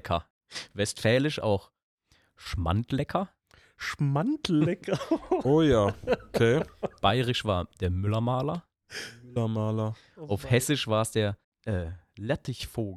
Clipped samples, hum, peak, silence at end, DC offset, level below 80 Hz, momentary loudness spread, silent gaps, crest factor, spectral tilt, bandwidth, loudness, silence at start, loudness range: under 0.1%; none; -10 dBFS; 0 s; under 0.1%; -48 dBFS; 14 LU; 0.30-0.41 s, 1.83-1.98 s, 11.44-11.52 s; 20 dB; -6 dB/octave; 14 kHz; -28 LUFS; 0.05 s; 4 LU